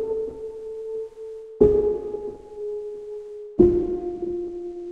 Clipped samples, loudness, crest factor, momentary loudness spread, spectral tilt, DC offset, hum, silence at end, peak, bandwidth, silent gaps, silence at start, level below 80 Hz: under 0.1%; -24 LUFS; 22 dB; 17 LU; -10.5 dB/octave; under 0.1%; none; 0 s; -2 dBFS; 3.8 kHz; none; 0 s; -42 dBFS